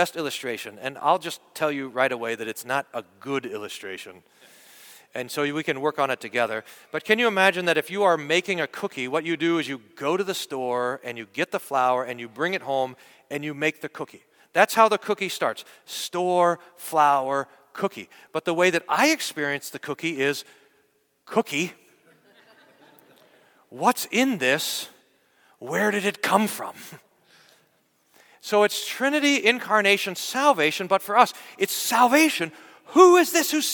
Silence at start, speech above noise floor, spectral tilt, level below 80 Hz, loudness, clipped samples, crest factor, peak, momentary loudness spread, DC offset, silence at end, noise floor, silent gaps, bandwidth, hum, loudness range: 0 s; 43 dB; -3 dB/octave; -76 dBFS; -23 LUFS; under 0.1%; 24 dB; -2 dBFS; 15 LU; under 0.1%; 0 s; -66 dBFS; none; 19 kHz; none; 9 LU